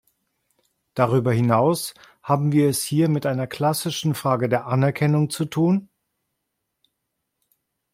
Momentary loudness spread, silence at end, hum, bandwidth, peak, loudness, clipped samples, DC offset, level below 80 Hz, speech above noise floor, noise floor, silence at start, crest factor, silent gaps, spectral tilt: 6 LU; 2.1 s; none; 16.5 kHz; -4 dBFS; -21 LUFS; under 0.1%; under 0.1%; -62 dBFS; 58 dB; -78 dBFS; 0.95 s; 20 dB; none; -6 dB/octave